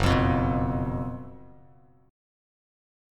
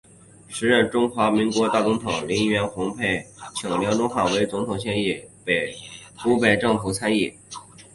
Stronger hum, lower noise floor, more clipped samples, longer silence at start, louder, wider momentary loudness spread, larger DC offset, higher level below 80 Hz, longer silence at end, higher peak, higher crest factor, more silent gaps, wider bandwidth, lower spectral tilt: neither; first, -57 dBFS vs -46 dBFS; neither; second, 0 s vs 0.5 s; second, -27 LUFS vs -22 LUFS; first, 17 LU vs 12 LU; neither; first, -38 dBFS vs -52 dBFS; first, 1.7 s vs 0.1 s; second, -10 dBFS vs -4 dBFS; about the same, 20 dB vs 20 dB; neither; first, 13.5 kHz vs 11.5 kHz; first, -7 dB/octave vs -4.5 dB/octave